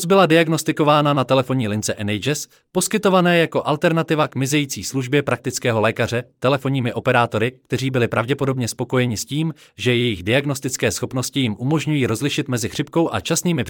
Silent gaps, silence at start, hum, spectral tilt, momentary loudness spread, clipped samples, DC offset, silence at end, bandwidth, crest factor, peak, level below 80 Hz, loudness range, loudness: none; 0 s; none; -5 dB/octave; 7 LU; under 0.1%; under 0.1%; 0 s; 18.5 kHz; 16 dB; -2 dBFS; -58 dBFS; 3 LU; -19 LUFS